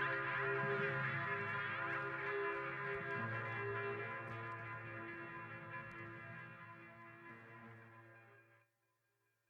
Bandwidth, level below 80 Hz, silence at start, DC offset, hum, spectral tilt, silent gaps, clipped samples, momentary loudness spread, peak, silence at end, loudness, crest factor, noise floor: 8.4 kHz; -78 dBFS; 0 s; under 0.1%; none; -7.5 dB/octave; none; under 0.1%; 18 LU; -28 dBFS; 0.95 s; -42 LUFS; 16 dB; -84 dBFS